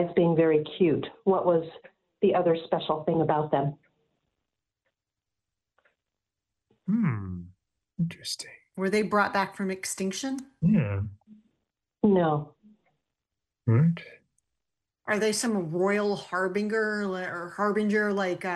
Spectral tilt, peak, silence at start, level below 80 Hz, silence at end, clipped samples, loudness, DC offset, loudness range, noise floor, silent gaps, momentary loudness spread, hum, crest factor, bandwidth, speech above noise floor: -6 dB/octave; -10 dBFS; 0 s; -64 dBFS; 0 s; under 0.1%; -27 LUFS; under 0.1%; 8 LU; -88 dBFS; none; 11 LU; none; 18 dB; 12.5 kHz; 62 dB